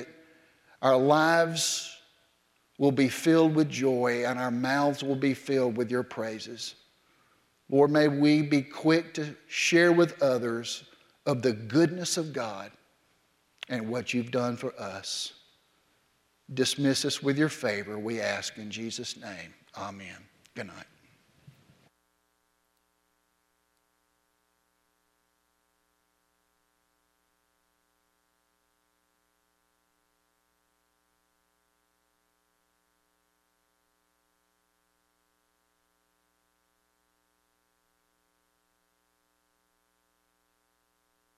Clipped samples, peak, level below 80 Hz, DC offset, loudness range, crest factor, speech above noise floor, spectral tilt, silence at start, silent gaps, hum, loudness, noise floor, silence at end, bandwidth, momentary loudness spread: under 0.1%; -8 dBFS; -78 dBFS; under 0.1%; 11 LU; 22 dB; 47 dB; -4.5 dB/octave; 0 s; none; none; -27 LUFS; -74 dBFS; 20.55 s; 15.5 kHz; 18 LU